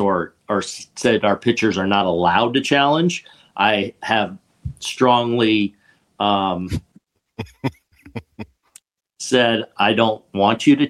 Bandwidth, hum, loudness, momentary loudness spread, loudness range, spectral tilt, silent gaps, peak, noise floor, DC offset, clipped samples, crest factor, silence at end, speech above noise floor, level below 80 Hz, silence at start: 12.5 kHz; none; -19 LUFS; 19 LU; 8 LU; -5 dB/octave; none; -2 dBFS; -56 dBFS; under 0.1%; under 0.1%; 18 dB; 0 s; 38 dB; -50 dBFS; 0 s